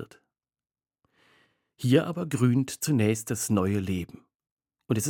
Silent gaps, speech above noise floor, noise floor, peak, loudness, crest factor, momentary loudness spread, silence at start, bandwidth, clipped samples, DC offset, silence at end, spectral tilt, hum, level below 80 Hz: 4.35-4.39 s, 4.51-4.57 s; over 64 dB; under -90 dBFS; -8 dBFS; -26 LUFS; 20 dB; 9 LU; 0 s; 19.5 kHz; under 0.1%; under 0.1%; 0 s; -6 dB/octave; none; -66 dBFS